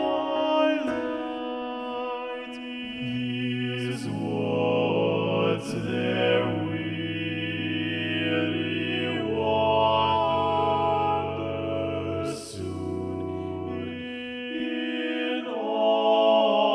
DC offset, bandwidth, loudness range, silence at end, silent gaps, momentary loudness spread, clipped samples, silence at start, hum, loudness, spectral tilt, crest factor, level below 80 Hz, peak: under 0.1%; 12 kHz; 6 LU; 0 s; none; 11 LU; under 0.1%; 0 s; none; -26 LUFS; -6 dB/octave; 16 dB; -62 dBFS; -10 dBFS